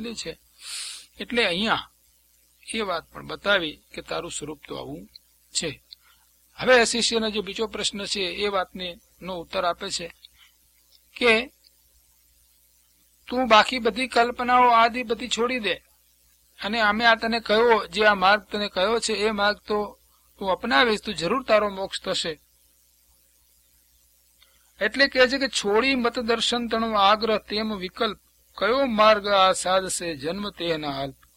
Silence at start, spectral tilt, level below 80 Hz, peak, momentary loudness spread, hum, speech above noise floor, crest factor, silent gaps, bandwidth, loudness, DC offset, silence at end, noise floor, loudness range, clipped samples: 0 s; -2.5 dB/octave; -54 dBFS; 0 dBFS; 16 LU; 60 Hz at -55 dBFS; 38 dB; 24 dB; none; 16.5 kHz; -23 LUFS; under 0.1%; 0.25 s; -61 dBFS; 8 LU; under 0.1%